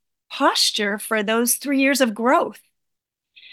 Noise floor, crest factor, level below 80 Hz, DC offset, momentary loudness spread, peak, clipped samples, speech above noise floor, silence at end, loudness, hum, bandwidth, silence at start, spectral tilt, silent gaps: -81 dBFS; 16 dB; -76 dBFS; under 0.1%; 6 LU; -4 dBFS; under 0.1%; 61 dB; 1 s; -19 LUFS; none; 18 kHz; 0.3 s; -2 dB/octave; none